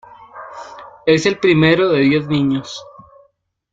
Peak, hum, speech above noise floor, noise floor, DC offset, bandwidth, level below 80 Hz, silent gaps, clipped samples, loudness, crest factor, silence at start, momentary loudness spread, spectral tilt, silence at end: -2 dBFS; none; 45 dB; -59 dBFS; under 0.1%; 7.8 kHz; -54 dBFS; none; under 0.1%; -15 LUFS; 16 dB; 0.35 s; 22 LU; -6 dB/octave; 0.9 s